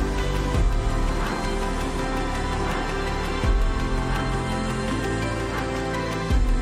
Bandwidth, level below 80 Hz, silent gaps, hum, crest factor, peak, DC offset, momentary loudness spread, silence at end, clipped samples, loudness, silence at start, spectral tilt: 13.5 kHz; -26 dBFS; none; none; 12 dB; -10 dBFS; under 0.1%; 3 LU; 0 s; under 0.1%; -26 LUFS; 0 s; -5.5 dB/octave